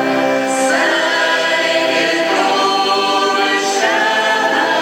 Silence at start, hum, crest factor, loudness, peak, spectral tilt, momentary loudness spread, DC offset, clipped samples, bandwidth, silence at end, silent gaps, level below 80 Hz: 0 s; none; 10 dB; -14 LUFS; -4 dBFS; -1.5 dB/octave; 1 LU; under 0.1%; under 0.1%; 18 kHz; 0 s; none; -72 dBFS